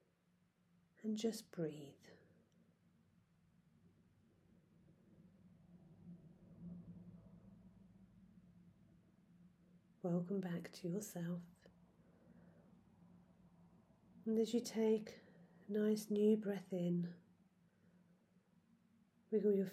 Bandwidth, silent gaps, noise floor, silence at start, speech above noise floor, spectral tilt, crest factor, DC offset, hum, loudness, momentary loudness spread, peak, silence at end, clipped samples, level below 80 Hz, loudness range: 15 kHz; none; -78 dBFS; 1.05 s; 38 dB; -6.5 dB/octave; 20 dB; under 0.1%; none; -41 LUFS; 25 LU; -24 dBFS; 0 s; under 0.1%; -82 dBFS; 21 LU